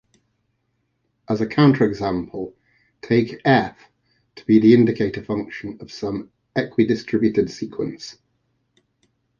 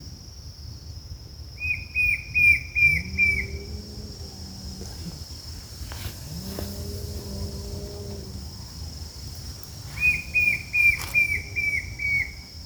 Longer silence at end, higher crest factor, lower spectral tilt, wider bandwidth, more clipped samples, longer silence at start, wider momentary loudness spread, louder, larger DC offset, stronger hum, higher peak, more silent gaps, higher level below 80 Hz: first, 1.3 s vs 0 s; about the same, 18 dB vs 18 dB; first, -7.5 dB/octave vs -3.5 dB/octave; second, 7.2 kHz vs over 20 kHz; neither; first, 1.3 s vs 0 s; second, 17 LU vs 21 LU; about the same, -20 LUFS vs -22 LUFS; neither; neither; first, -2 dBFS vs -8 dBFS; neither; second, -54 dBFS vs -42 dBFS